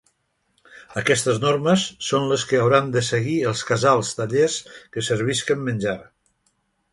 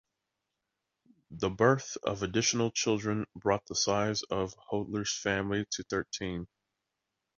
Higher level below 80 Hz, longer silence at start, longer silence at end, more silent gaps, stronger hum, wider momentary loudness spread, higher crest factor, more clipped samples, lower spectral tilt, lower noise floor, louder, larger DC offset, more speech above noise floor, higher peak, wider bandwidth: about the same, -58 dBFS vs -58 dBFS; second, 0.7 s vs 1.3 s; about the same, 0.9 s vs 0.9 s; neither; neither; about the same, 9 LU vs 9 LU; about the same, 20 dB vs 22 dB; neither; about the same, -4.5 dB/octave vs -4 dB/octave; second, -70 dBFS vs -86 dBFS; first, -21 LUFS vs -31 LUFS; neither; second, 49 dB vs 55 dB; first, -2 dBFS vs -10 dBFS; first, 11.5 kHz vs 7.8 kHz